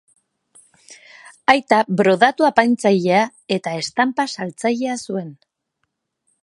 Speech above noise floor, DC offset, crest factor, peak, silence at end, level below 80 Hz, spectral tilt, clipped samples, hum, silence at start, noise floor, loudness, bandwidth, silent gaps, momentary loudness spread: 57 dB; under 0.1%; 20 dB; 0 dBFS; 1.1 s; -66 dBFS; -5 dB/octave; under 0.1%; none; 0.9 s; -74 dBFS; -18 LUFS; 11.5 kHz; none; 10 LU